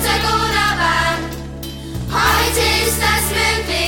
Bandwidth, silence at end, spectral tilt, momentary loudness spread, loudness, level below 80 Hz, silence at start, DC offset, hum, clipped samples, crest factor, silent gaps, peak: 19 kHz; 0 s; -3 dB/octave; 13 LU; -15 LUFS; -28 dBFS; 0 s; under 0.1%; none; under 0.1%; 14 dB; none; -2 dBFS